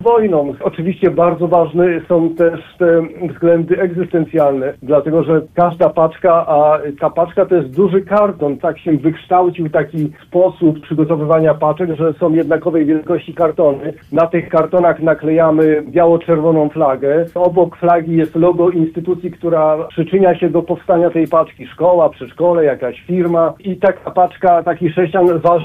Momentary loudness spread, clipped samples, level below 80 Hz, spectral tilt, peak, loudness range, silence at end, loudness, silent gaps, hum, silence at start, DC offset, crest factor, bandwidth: 6 LU; under 0.1%; -50 dBFS; -10 dB/octave; -2 dBFS; 2 LU; 0 s; -14 LUFS; none; none; 0 s; under 0.1%; 12 dB; 3.9 kHz